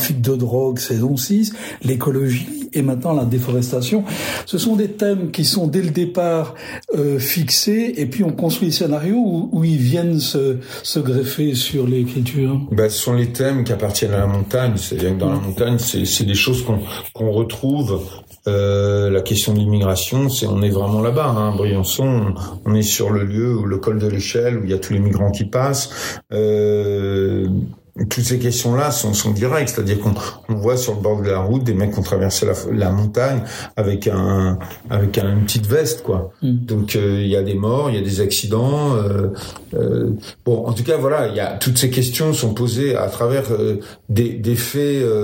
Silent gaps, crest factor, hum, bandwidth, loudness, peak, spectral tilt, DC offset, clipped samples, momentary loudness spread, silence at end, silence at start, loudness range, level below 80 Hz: none; 16 dB; none; 16.5 kHz; -18 LUFS; 0 dBFS; -5.5 dB/octave; under 0.1%; under 0.1%; 5 LU; 0 s; 0 s; 2 LU; -48 dBFS